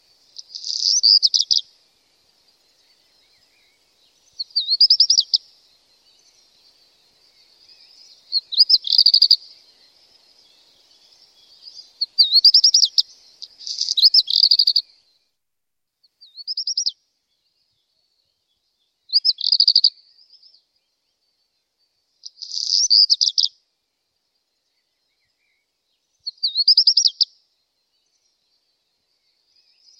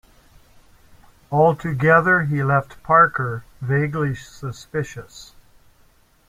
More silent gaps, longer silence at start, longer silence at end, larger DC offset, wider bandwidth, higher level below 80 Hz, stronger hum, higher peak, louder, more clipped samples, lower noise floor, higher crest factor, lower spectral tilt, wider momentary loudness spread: neither; second, 0.55 s vs 1.3 s; first, 2.75 s vs 1.05 s; neither; first, 16.5 kHz vs 14.5 kHz; second, -84 dBFS vs -52 dBFS; neither; about the same, -2 dBFS vs -2 dBFS; first, -14 LUFS vs -19 LUFS; neither; first, -83 dBFS vs -56 dBFS; about the same, 20 dB vs 20 dB; second, 6.5 dB/octave vs -7.5 dB/octave; about the same, 16 LU vs 17 LU